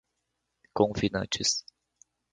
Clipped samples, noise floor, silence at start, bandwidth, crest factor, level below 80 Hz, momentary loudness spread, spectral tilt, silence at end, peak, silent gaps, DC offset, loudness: under 0.1%; -81 dBFS; 0.75 s; 11 kHz; 24 dB; -54 dBFS; 6 LU; -3.5 dB/octave; 0.75 s; -8 dBFS; none; under 0.1%; -28 LUFS